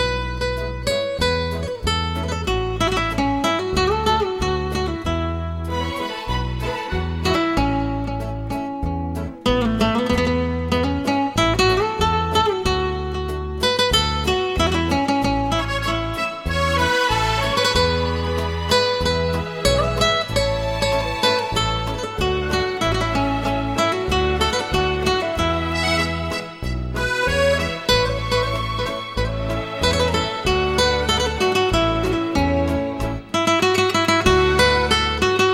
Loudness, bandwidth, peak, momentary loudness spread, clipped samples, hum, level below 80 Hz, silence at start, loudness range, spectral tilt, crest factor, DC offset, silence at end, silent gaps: -20 LUFS; 16.5 kHz; 0 dBFS; 8 LU; under 0.1%; none; -30 dBFS; 0 s; 3 LU; -4.5 dB/octave; 20 dB; 0.1%; 0 s; none